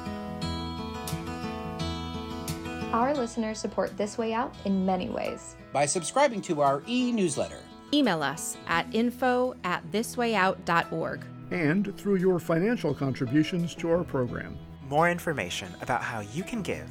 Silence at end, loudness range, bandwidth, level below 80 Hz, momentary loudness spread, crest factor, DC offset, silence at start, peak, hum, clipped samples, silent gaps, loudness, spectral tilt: 0 s; 4 LU; 16.5 kHz; -52 dBFS; 10 LU; 20 dB; under 0.1%; 0 s; -10 dBFS; none; under 0.1%; none; -29 LUFS; -5 dB/octave